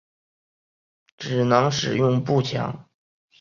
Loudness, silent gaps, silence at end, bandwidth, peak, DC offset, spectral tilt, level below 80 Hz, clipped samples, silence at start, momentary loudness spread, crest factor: -22 LUFS; none; 0.6 s; 7.4 kHz; -2 dBFS; under 0.1%; -6 dB/octave; -60 dBFS; under 0.1%; 1.2 s; 13 LU; 22 dB